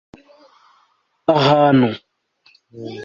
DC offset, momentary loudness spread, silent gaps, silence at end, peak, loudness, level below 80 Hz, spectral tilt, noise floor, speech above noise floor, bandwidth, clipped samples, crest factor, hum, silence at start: under 0.1%; 21 LU; none; 0 s; -2 dBFS; -15 LUFS; -58 dBFS; -7.5 dB/octave; -62 dBFS; 47 dB; 7.4 kHz; under 0.1%; 18 dB; none; 1.3 s